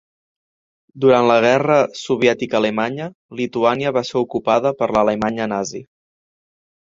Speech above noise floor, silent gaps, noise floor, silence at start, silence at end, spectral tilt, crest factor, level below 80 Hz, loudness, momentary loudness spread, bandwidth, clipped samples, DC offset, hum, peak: over 73 dB; 3.15-3.29 s; under -90 dBFS; 0.95 s; 1.05 s; -5.5 dB/octave; 18 dB; -56 dBFS; -18 LUFS; 11 LU; 7.8 kHz; under 0.1%; under 0.1%; none; 0 dBFS